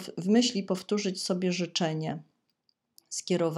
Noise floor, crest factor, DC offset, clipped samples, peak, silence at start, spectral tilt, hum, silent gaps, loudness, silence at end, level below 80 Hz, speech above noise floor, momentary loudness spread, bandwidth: -75 dBFS; 18 dB; under 0.1%; under 0.1%; -12 dBFS; 0 s; -4.5 dB/octave; none; none; -29 LUFS; 0 s; -80 dBFS; 47 dB; 12 LU; 14.5 kHz